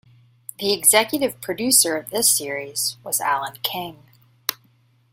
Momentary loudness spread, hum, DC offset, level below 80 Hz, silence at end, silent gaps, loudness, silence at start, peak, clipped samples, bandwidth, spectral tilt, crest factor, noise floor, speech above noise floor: 13 LU; none; under 0.1%; -66 dBFS; 0.6 s; none; -19 LUFS; 0.6 s; 0 dBFS; under 0.1%; 16.5 kHz; -1 dB/octave; 22 dB; -59 dBFS; 38 dB